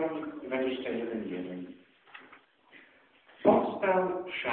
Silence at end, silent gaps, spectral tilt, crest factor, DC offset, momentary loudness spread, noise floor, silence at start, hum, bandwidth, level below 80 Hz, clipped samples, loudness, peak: 0 s; none; -9.5 dB/octave; 24 dB; under 0.1%; 25 LU; -61 dBFS; 0 s; none; 4.3 kHz; -70 dBFS; under 0.1%; -31 LUFS; -8 dBFS